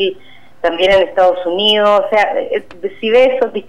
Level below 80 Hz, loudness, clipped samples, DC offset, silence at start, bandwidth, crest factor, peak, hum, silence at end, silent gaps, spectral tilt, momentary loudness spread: -44 dBFS; -13 LUFS; under 0.1%; 2%; 0 s; 10 kHz; 12 dB; -2 dBFS; none; 0.05 s; none; -4 dB/octave; 10 LU